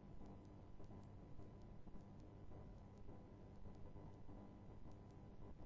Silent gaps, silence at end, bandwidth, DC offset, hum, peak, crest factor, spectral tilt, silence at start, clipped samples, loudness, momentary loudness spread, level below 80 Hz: none; 0 s; 7.2 kHz; under 0.1%; 50 Hz at -65 dBFS; -44 dBFS; 12 dB; -8.5 dB/octave; 0 s; under 0.1%; -61 LUFS; 1 LU; -64 dBFS